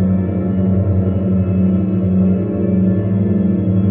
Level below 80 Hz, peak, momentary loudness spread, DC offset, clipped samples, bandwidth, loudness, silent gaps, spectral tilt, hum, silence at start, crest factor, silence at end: -38 dBFS; -4 dBFS; 2 LU; under 0.1%; under 0.1%; 3.1 kHz; -16 LUFS; none; -12 dB/octave; none; 0 s; 10 dB; 0 s